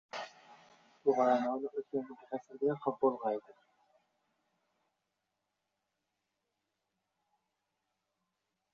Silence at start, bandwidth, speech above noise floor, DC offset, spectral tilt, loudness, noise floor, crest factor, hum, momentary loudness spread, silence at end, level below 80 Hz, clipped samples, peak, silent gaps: 0.15 s; 7.2 kHz; 52 dB; under 0.1%; -5 dB/octave; -35 LUFS; -86 dBFS; 22 dB; none; 14 LU; 5.35 s; -86 dBFS; under 0.1%; -16 dBFS; none